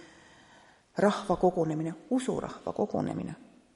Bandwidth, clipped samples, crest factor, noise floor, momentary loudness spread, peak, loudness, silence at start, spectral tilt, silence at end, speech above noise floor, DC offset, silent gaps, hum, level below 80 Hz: 11.5 kHz; under 0.1%; 20 dB; -59 dBFS; 12 LU; -12 dBFS; -30 LUFS; 0 s; -6.5 dB/octave; 0.3 s; 29 dB; under 0.1%; none; none; -60 dBFS